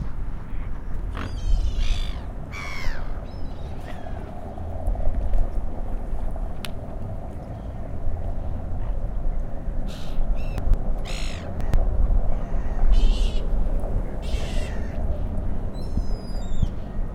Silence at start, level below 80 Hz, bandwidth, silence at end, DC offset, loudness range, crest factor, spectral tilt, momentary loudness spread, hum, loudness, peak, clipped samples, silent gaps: 0 s; -24 dBFS; 8.4 kHz; 0 s; under 0.1%; 6 LU; 16 dB; -6.5 dB/octave; 9 LU; none; -31 LUFS; -6 dBFS; under 0.1%; none